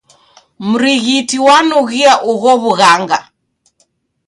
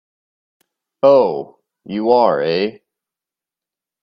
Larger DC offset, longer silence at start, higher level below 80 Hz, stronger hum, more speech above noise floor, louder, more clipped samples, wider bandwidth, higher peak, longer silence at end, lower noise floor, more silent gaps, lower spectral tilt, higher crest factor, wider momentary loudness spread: neither; second, 0.6 s vs 1.05 s; first, -58 dBFS vs -64 dBFS; neither; second, 50 dB vs 74 dB; first, -10 LUFS vs -15 LUFS; neither; first, 11.5 kHz vs 6 kHz; about the same, 0 dBFS vs 0 dBFS; second, 1.05 s vs 1.3 s; second, -60 dBFS vs -88 dBFS; neither; second, -3 dB/octave vs -7.5 dB/octave; second, 12 dB vs 18 dB; second, 9 LU vs 15 LU